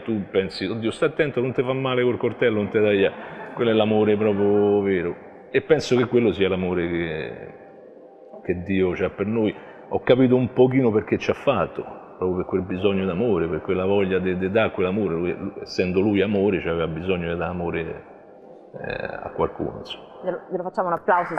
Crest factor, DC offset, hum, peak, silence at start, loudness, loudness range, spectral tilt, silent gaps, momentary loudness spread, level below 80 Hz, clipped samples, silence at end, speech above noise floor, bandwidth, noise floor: 20 dB; under 0.1%; none; -2 dBFS; 0 s; -22 LUFS; 6 LU; -7.5 dB/octave; none; 12 LU; -52 dBFS; under 0.1%; 0 s; 23 dB; 9.2 kHz; -45 dBFS